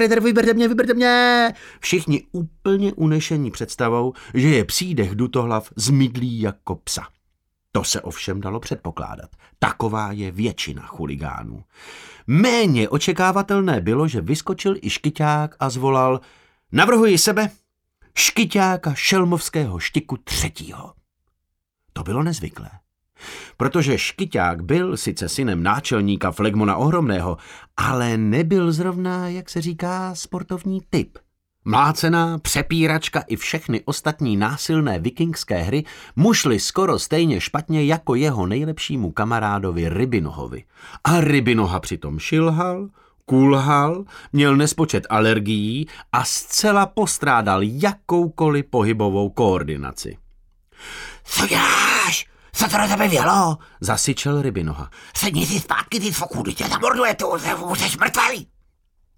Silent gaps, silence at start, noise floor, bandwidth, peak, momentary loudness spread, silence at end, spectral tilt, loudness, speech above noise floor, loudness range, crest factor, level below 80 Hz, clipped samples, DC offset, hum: none; 0 s; -76 dBFS; 19 kHz; -2 dBFS; 12 LU; 0.75 s; -4.5 dB/octave; -20 LUFS; 56 dB; 7 LU; 18 dB; -44 dBFS; under 0.1%; under 0.1%; none